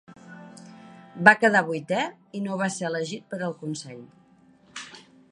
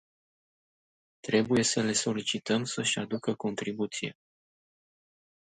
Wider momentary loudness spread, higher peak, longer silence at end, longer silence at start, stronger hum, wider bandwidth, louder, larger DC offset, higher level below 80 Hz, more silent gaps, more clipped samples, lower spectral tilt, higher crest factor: first, 27 LU vs 8 LU; first, 0 dBFS vs -12 dBFS; second, 0.3 s vs 1.45 s; second, 0.1 s vs 1.25 s; neither; about the same, 11.5 kHz vs 11 kHz; first, -24 LUFS vs -29 LUFS; neither; about the same, -72 dBFS vs -68 dBFS; neither; neither; about the same, -4.5 dB/octave vs -3.5 dB/octave; first, 26 dB vs 20 dB